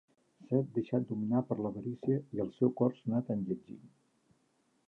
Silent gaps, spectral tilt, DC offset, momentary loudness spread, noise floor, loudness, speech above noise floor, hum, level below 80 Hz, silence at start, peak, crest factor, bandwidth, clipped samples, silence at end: none; -11 dB/octave; under 0.1%; 8 LU; -74 dBFS; -34 LUFS; 41 dB; none; -72 dBFS; 0.5 s; -16 dBFS; 20 dB; 4.1 kHz; under 0.1%; 1 s